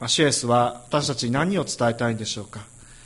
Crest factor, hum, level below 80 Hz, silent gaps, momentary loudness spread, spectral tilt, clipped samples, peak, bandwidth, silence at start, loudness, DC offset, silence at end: 16 dB; none; -54 dBFS; none; 12 LU; -4 dB/octave; under 0.1%; -8 dBFS; 11.5 kHz; 0 s; -23 LUFS; under 0.1%; 0.05 s